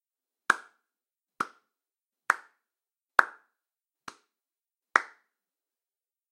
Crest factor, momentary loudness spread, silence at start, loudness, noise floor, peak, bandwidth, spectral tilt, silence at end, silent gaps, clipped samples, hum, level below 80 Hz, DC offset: 32 dB; 23 LU; 0.5 s; -29 LUFS; under -90 dBFS; -2 dBFS; 16 kHz; -1 dB/octave; 1.25 s; none; under 0.1%; none; -82 dBFS; under 0.1%